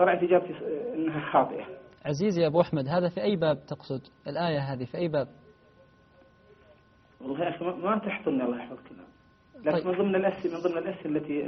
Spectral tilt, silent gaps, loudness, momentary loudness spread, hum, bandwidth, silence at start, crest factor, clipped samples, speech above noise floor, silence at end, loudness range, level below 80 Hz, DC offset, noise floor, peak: -5.5 dB/octave; none; -29 LUFS; 12 LU; none; 6.2 kHz; 0 s; 22 dB; under 0.1%; 31 dB; 0 s; 7 LU; -66 dBFS; under 0.1%; -59 dBFS; -8 dBFS